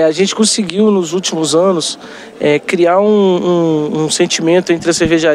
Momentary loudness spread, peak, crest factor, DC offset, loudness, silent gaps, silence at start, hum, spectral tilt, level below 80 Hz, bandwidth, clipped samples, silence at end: 6 LU; 0 dBFS; 12 dB; under 0.1%; -12 LUFS; none; 0 s; none; -4 dB/octave; -46 dBFS; 13.5 kHz; under 0.1%; 0 s